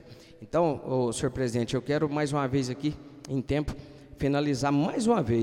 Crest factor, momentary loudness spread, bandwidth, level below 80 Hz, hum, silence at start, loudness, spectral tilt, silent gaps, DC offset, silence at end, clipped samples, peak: 18 dB; 8 LU; 13 kHz; -50 dBFS; none; 0.05 s; -28 LUFS; -6.5 dB/octave; none; under 0.1%; 0 s; under 0.1%; -10 dBFS